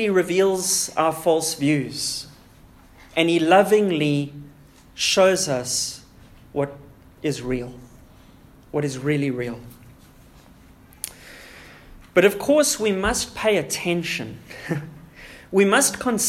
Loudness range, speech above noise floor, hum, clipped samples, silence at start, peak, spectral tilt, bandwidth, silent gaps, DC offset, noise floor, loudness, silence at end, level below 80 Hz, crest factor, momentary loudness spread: 9 LU; 28 dB; none; under 0.1%; 0 s; -2 dBFS; -3.5 dB/octave; 16 kHz; none; under 0.1%; -49 dBFS; -21 LUFS; 0 s; -50 dBFS; 20 dB; 21 LU